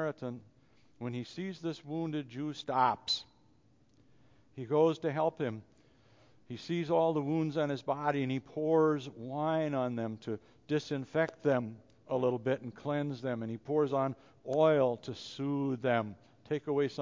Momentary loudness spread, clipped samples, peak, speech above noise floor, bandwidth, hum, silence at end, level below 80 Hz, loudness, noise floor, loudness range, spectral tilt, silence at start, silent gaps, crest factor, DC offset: 13 LU; under 0.1%; -14 dBFS; 35 dB; 7.6 kHz; none; 0 s; -74 dBFS; -33 LUFS; -67 dBFS; 4 LU; -7 dB/octave; 0 s; none; 20 dB; under 0.1%